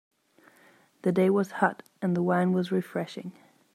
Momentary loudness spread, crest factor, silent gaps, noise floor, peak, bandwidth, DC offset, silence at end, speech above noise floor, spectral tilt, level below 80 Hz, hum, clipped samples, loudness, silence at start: 12 LU; 20 dB; none; -60 dBFS; -8 dBFS; 14.5 kHz; under 0.1%; 0.45 s; 34 dB; -7.5 dB/octave; -76 dBFS; none; under 0.1%; -27 LUFS; 1.05 s